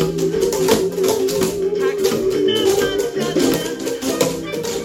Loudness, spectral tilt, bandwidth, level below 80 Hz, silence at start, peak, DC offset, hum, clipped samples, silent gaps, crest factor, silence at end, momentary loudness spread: -18 LUFS; -4 dB/octave; 17 kHz; -46 dBFS; 0 s; -2 dBFS; under 0.1%; none; under 0.1%; none; 16 dB; 0 s; 5 LU